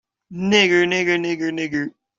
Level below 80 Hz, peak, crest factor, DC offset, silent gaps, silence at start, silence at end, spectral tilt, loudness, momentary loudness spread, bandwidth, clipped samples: -60 dBFS; -2 dBFS; 18 dB; under 0.1%; none; 0.3 s; 0.3 s; -4 dB/octave; -19 LUFS; 12 LU; 7.6 kHz; under 0.1%